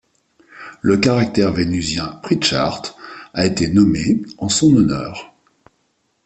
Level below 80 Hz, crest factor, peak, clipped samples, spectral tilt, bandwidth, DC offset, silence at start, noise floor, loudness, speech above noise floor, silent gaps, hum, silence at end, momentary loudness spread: -44 dBFS; 16 dB; -2 dBFS; under 0.1%; -5 dB/octave; 8.8 kHz; under 0.1%; 0.55 s; -66 dBFS; -17 LUFS; 49 dB; none; none; 1 s; 16 LU